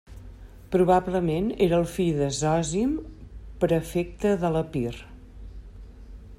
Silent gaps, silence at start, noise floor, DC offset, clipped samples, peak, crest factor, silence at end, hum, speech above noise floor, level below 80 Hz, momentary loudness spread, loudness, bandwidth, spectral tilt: none; 0.1 s; -44 dBFS; under 0.1%; under 0.1%; -8 dBFS; 18 dB; 0.05 s; none; 20 dB; -44 dBFS; 23 LU; -25 LUFS; 15.5 kHz; -6 dB/octave